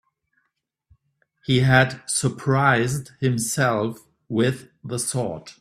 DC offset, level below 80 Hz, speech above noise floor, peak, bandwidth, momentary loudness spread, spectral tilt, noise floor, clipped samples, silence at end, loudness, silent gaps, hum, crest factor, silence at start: under 0.1%; -54 dBFS; 55 dB; -2 dBFS; 14 kHz; 13 LU; -4.5 dB/octave; -76 dBFS; under 0.1%; 0.1 s; -22 LUFS; none; none; 22 dB; 1.5 s